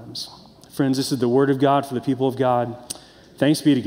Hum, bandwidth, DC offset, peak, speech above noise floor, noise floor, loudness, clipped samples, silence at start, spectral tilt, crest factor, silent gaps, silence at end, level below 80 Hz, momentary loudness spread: none; 16 kHz; under 0.1%; -6 dBFS; 25 dB; -45 dBFS; -21 LUFS; under 0.1%; 0 s; -6 dB/octave; 16 dB; none; 0 s; -62 dBFS; 17 LU